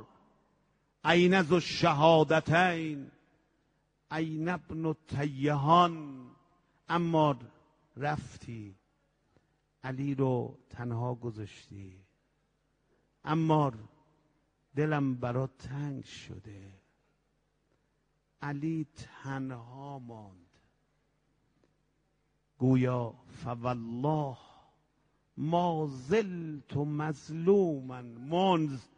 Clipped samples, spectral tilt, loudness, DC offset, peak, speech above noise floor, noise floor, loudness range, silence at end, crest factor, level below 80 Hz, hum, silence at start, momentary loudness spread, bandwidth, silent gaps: under 0.1%; -7 dB/octave; -30 LUFS; under 0.1%; -10 dBFS; 45 dB; -76 dBFS; 13 LU; 0.15 s; 22 dB; -66 dBFS; none; 0 s; 21 LU; 9.6 kHz; none